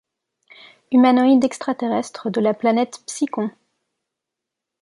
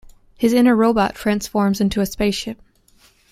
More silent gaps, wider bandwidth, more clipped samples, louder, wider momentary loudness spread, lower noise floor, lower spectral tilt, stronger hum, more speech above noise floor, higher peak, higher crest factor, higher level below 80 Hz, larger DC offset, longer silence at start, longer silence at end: neither; second, 11.5 kHz vs 16 kHz; neither; about the same, -19 LUFS vs -18 LUFS; about the same, 11 LU vs 10 LU; first, -84 dBFS vs -55 dBFS; about the same, -5 dB/octave vs -5.5 dB/octave; neither; first, 65 dB vs 37 dB; about the same, -4 dBFS vs -4 dBFS; about the same, 16 dB vs 16 dB; second, -70 dBFS vs -42 dBFS; neither; first, 0.9 s vs 0.4 s; first, 1.3 s vs 0.75 s